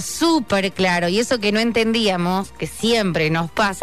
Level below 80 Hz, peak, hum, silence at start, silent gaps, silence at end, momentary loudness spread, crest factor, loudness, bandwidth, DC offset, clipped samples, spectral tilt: -46 dBFS; -8 dBFS; none; 0 s; none; 0 s; 4 LU; 12 dB; -19 LUFS; 13.5 kHz; 0.8%; under 0.1%; -4.5 dB/octave